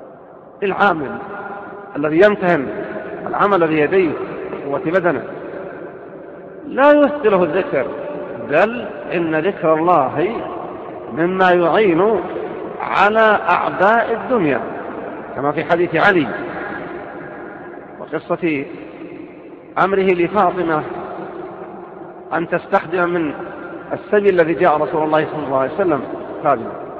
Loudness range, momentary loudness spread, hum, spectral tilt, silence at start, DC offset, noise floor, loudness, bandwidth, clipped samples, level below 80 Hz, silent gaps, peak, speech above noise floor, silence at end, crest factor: 5 LU; 18 LU; none; -8 dB/octave; 0 s; under 0.1%; -39 dBFS; -17 LUFS; 7 kHz; under 0.1%; -54 dBFS; none; 0 dBFS; 24 dB; 0 s; 18 dB